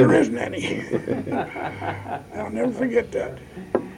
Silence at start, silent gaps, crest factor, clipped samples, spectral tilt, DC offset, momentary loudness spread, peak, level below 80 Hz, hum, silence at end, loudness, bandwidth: 0 s; none; 18 dB; under 0.1%; -6.5 dB/octave; under 0.1%; 10 LU; -6 dBFS; -52 dBFS; none; 0 s; -25 LUFS; 15 kHz